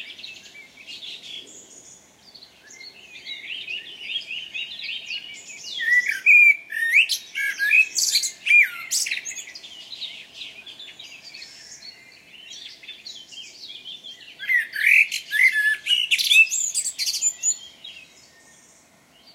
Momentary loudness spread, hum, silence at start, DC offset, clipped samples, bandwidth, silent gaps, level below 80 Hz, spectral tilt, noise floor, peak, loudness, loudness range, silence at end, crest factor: 24 LU; none; 0 s; under 0.1%; under 0.1%; 16 kHz; none; -76 dBFS; 4 dB/octave; -55 dBFS; -6 dBFS; -18 LUFS; 21 LU; 1.35 s; 18 dB